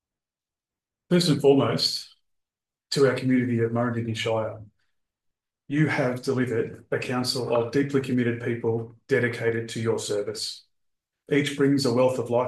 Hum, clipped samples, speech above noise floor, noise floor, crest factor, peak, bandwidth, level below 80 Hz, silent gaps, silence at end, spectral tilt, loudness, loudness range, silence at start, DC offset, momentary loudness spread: none; under 0.1%; over 66 dB; under -90 dBFS; 18 dB; -8 dBFS; 12.5 kHz; -68 dBFS; none; 0 s; -5.5 dB/octave; -25 LUFS; 4 LU; 1.1 s; under 0.1%; 9 LU